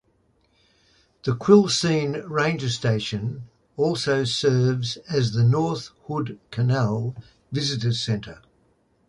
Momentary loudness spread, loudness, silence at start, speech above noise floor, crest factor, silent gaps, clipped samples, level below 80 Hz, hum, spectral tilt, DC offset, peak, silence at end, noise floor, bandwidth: 13 LU; -23 LUFS; 1.25 s; 42 dB; 20 dB; none; under 0.1%; -56 dBFS; none; -5.5 dB/octave; under 0.1%; -4 dBFS; 0.75 s; -65 dBFS; 11.5 kHz